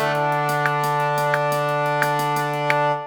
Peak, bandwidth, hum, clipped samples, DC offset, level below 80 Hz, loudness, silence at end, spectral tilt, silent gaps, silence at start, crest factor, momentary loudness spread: 0 dBFS; over 20 kHz; none; under 0.1%; under 0.1%; -68 dBFS; -21 LUFS; 0 s; -5 dB/octave; none; 0 s; 20 dB; 1 LU